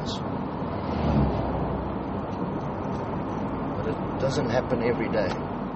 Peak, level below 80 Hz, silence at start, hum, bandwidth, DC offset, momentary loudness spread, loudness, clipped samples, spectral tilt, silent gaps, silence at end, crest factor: -10 dBFS; -40 dBFS; 0 s; none; 8 kHz; under 0.1%; 6 LU; -28 LUFS; under 0.1%; -6.5 dB/octave; none; 0 s; 16 dB